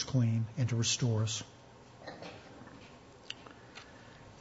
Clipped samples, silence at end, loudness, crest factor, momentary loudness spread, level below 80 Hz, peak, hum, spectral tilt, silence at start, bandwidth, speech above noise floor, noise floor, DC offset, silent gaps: under 0.1%; 0 s; -33 LUFS; 18 dB; 23 LU; -66 dBFS; -18 dBFS; none; -4.5 dB/octave; 0 s; 8 kHz; 23 dB; -55 dBFS; under 0.1%; none